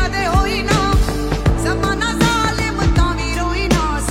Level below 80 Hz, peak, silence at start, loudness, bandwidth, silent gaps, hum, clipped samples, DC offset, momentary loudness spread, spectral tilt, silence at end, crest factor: -22 dBFS; -2 dBFS; 0 s; -17 LUFS; 16 kHz; none; none; under 0.1%; under 0.1%; 3 LU; -5 dB/octave; 0 s; 14 dB